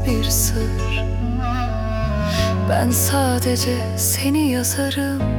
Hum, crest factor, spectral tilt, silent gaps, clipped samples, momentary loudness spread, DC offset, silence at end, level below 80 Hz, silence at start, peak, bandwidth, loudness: none; 14 dB; -4.5 dB/octave; none; under 0.1%; 5 LU; under 0.1%; 0 s; -28 dBFS; 0 s; -4 dBFS; 18 kHz; -19 LUFS